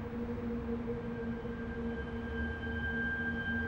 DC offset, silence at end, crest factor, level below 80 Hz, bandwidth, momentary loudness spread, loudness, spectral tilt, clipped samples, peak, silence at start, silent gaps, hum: under 0.1%; 0 s; 12 dB; -46 dBFS; 6.8 kHz; 5 LU; -38 LUFS; -8 dB/octave; under 0.1%; -24 dBFS; 0 s; none; none